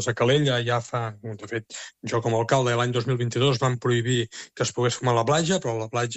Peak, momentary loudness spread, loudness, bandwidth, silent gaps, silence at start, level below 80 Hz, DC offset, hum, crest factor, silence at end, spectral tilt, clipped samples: -6 dBFS; 11 LU; -24 LUFS; 8.4 kHz; none; 0 s; -60 dBFS; under 0.1%; none; 18 dB; 0 s; -5 dB/octave; under 0.1%